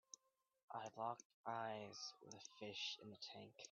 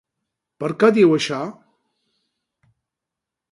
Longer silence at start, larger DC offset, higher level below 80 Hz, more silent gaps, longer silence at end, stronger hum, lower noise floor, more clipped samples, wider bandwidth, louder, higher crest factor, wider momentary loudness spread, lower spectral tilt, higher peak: about the same, 0.7 s vs 0.6 s; neither; second, under -90 dBFS vs -68 dBFS; first, 1.25-1.44 s vs none; second, 0 s vs 2 s; neither; second, -80 dBFS vs -85 dBFS; neither; second, 7.2 kHz vs 11.5 kHz; second, -52 LUFS vs -18 LUFS; about the same, 20 dB vs 20 dB; second, 11 LU vs 15 LU; second, -1.5 dB/octave vs -6 dB/octave; second, -32 dBFS vs -2 dBFS